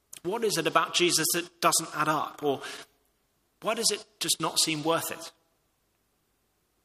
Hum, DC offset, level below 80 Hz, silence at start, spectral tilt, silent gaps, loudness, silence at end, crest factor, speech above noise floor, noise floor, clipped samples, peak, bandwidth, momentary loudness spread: none; under 0.1%; -74 dBFS; 0.25 s; -2 dB/octave; none; -27 LUFS; 1.55 s; 24 dB; 45 dB; -73 dBFS; under 0.1%; -6 dBFS; 15.5 kHz; 12 LU